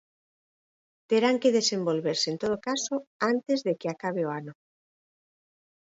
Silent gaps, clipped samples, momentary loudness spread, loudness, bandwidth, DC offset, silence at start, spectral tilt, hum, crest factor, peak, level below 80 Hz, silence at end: 3.07-3.20 s; under 0.1%; 9 LU; -27 LUFS; 8 kHz; under 0.1%; 1.1 s; -4 dB/octave; none; 18 dB; -12 dBFS; -72 dBFS; 1.45 s